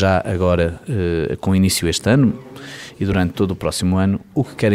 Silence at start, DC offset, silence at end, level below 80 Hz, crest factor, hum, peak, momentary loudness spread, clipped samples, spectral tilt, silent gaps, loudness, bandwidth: 0 s; 0.4%; 0 s; -38 dBFS; 14 dB; none; -4 dBFS; 9 LU; under 0.1%; -5.5 dB/octave; none; -18 LUFS; 16 kHz